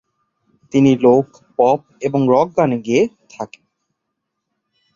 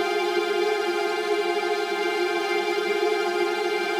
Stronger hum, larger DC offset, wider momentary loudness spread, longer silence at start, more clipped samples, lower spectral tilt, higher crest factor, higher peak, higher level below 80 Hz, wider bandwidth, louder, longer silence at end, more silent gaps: neither; neither; first, 18 LU vs 1 LU; first, 0.75 s vs 0 s; neither; first, -7.5 dB/octave vs -2.5 dB/octave; about the same, 16 dB vs 12 dB; first, -2 dBFS vs -12 dBFS; first, -58 dBFS vs -74 dBFS; second, 7.4 kHz vs 16 kHz; first, -16 LUFS vs -24 LUFS; first, 1.5 s vs 0 s; neither